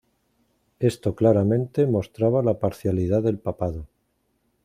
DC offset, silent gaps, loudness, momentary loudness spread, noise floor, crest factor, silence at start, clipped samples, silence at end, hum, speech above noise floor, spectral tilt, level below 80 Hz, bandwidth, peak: under 0.1%; none; -23 LUFS; 8 LU; -71 dBFS; 18 dB; 0.8 s; under 0.1%; 0.8 s; none; 49 dB; -9 dB/octave; -50 dBFS; 14.5 kHz; -6 dBFS